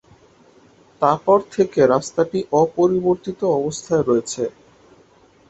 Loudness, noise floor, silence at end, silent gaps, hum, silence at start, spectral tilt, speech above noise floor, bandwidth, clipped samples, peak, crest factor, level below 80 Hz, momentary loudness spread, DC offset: -19 LUFS; -53 dBFS; 1 s; none; none; 1 s; -6 dB/octave; 34 dB; 8.2 kHz; under 0.1%; 0 dBFS; 20 dB; -56 dBFS; 5 LU; under 0.1%